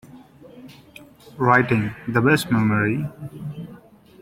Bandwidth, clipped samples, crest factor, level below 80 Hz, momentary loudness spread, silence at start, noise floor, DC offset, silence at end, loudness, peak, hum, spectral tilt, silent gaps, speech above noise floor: 16.5 kHz; under 0.1%; 20 dB; -54 dBFS; 17 LU; 0.15 s; -46 dBFS; under 0.1%; 0.45 s; -20 LUFS; -2 dBFS; none; -6.5 dB/octave; none; 26 dB